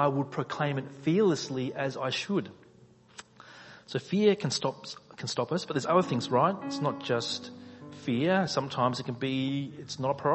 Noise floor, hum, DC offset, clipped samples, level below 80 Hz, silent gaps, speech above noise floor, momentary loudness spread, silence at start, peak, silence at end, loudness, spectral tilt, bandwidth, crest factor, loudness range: -58 dBFS; none; under 0.1%; under 0.1%; -70 dBFS; none; 29 dB; 20 LU; 0 s; -10 dBFS; 0 s; -30 LUFS; -5.5 dB/octave; 8.6 kHz; 20 dB; 3 LU